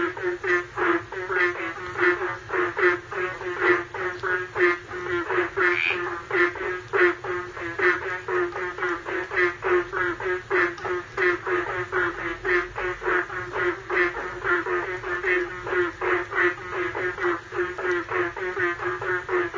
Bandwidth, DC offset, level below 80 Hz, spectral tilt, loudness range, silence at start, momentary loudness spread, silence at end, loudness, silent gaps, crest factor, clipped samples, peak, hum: 7.6 kHz; under 0.1%; -52 dBFS; -5.5 dB/octave; 2 LU; 0 s; 7 LU; 0 s; -25 LUFS; none; 18 dB; under 0.1%; -6 dBFS; none